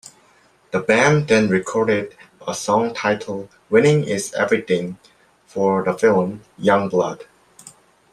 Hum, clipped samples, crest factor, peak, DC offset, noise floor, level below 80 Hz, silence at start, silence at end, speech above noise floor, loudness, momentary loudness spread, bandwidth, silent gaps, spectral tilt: none; under 0.1%; 18 dB; -2 dBFS; under 0.1%; -55 dBFS; -60 dBFS; 0.75 s; 0.45 s; 37 dB; -19 LUFS; 15 LU; 13 kHz; none; -5.5 dB/octave